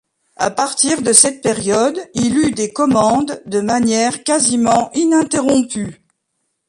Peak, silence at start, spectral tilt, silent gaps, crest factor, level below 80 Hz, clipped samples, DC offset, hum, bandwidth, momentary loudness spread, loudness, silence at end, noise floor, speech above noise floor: 0 dBFS; 0.4 s; -3 dB/octave; none; 16 dB; -50 dBFS; under 0.1%; under 0.1%; none; 14.5 kHz; 10 LU; -15 LUFS; 0.75 s; -71 dBFS; 56 dB